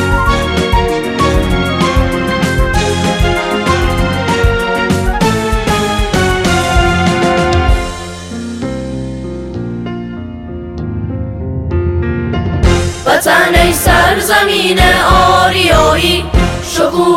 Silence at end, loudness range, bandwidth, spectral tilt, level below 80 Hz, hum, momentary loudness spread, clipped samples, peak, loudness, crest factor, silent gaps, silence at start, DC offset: 0 s; 11 LU; 17 kHz; -4.5 dB/octave; -20 dBFS; none; 13 LU; under 0.1%; 0 dBFS; -12 LUFS; 12 dB; none; 0 s; under 0.1%